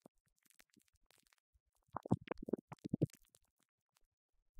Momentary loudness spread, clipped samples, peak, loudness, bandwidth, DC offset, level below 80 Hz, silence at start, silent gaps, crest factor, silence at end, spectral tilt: 8 LU; under 0.1%; -20 dBFS; -44 LUFS; 16 kHz; under 0.1%; -72 dBFS; 1.95 s; 2.61-2.68 s; 28 dB; 1.5 s; -8.5 dB/octave